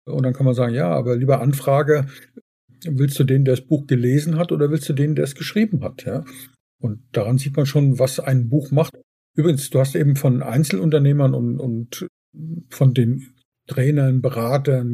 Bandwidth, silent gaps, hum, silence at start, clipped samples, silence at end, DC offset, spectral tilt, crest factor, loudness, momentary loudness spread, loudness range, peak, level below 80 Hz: 15 kHz; 2.41-2.68 s, 6.60-6.79 s, 9.03-9.34 s, 12.09-12.33 s, 13.45-13.52 s; none; 0.05 s; under 0.1%; 0 s; under 0.1%; -7.5 dB/octave; 14 dB; -19 LUFS; 12 LU; 3 LU; -4 dBFS; -62 dBFS